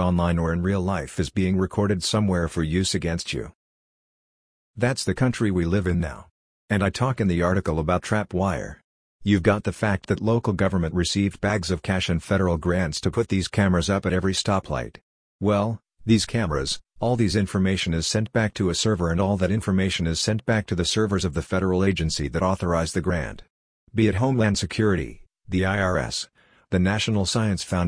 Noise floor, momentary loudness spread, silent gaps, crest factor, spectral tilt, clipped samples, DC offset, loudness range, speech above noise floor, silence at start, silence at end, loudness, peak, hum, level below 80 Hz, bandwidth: under -90 dBFS; 6 LU; 3.55-4.74 s, 6.31-6.68 s, 8.84-9.20 s, 15.03-15.39 s, 23.50-23.87 s; 18 dB; -5.5 dB/octave; under 0.1%; under 0.1%; 3 LU; over 67 dB; 0 s; 0 s; -24 LUFS; -6 dBFS; none; -42 dBFS; 10.5 kHz